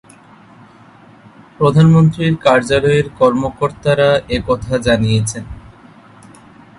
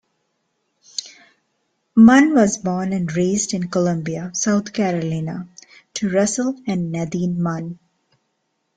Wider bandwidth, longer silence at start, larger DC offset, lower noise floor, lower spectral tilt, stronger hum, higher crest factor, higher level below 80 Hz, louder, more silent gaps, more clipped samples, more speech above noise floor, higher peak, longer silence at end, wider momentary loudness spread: first, 11.5 kHz vs 9.4 kHz; first, 1.6 s vs 1 s; neither; second, -43 dBFS vs -71 dBFS; about the same, -6.5 dB/octave vs -5.5 dB/octave; neither; about the same, 16 dB vs 18 dB; first, -38 dBFS vs -56 dBFS; first, -14 LUFS vs -19 LUFS; neither; neither; second, 30 dB vs 54 dB; about the same, 0 dBFS vs -2 dBFS; first, 1.2 s vs 1.05 s; second, 8 LU vs 17 LU